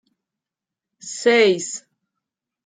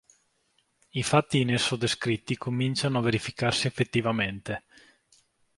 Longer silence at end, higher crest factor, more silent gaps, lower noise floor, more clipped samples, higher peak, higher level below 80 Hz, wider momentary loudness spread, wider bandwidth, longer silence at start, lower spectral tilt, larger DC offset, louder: second, 0.85 s vs 1 s; about the same, 18 dB vs 22 dB; neither; first, -87 dBFS vs -71 dBFS; neither; about the same, -4 dBFS vs -6 dBFS; second, -74 dBFS vs -58 dBFS; first, 19 LU vs 8 LU; second, 9.6 kHz vs 11.5 kHz; about the same, 1.05 s vs 0.95 s; second, -2.5 dB/octave vs -5 dB/octave; neither; first, -17 LUFS vs -27 LUFS